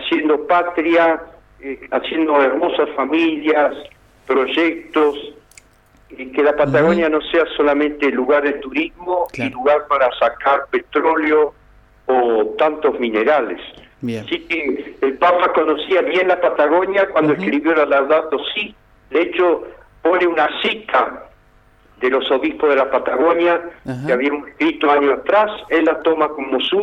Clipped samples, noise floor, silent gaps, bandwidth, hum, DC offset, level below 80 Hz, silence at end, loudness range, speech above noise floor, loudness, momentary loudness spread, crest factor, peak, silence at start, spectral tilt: under 0.1%; -51 dBFS; none; 8.2 kHz; none; under 0.1%; -52 dBFS; 0 s; 3 LU; 35 dB; -17 LUFS; 9 LU; 14 dB; -4 dBFS; 0 s; -6.5 dB/octave